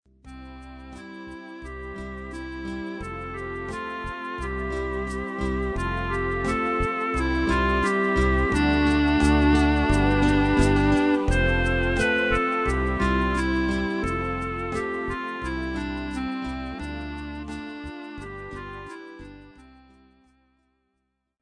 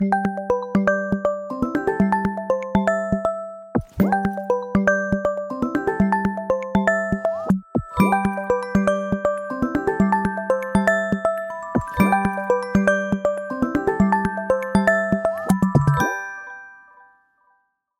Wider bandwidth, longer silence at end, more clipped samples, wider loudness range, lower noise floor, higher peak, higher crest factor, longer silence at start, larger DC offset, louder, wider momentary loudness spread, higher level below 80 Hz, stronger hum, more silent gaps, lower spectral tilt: second, 10 kHz vs 15.5 kHz; first, 1.75 s vs 1.25 s; neither; first, 16 LU vs 2 LU; first, -77 dBFS vs -66 dBFS; about the same, -6 dBFS vs -4 dBFS; about the same, 18 dB vs 16 dB; first, 0.25 s vs 0 s; neither; second, -24 LUFS vs -21 LUFS; first, 18 LU vs 6 LU; first, -32 dBFS vs -44 dBFS; neither; neither; about the same, -6.5 dB/octave vs -7.5 dB/octave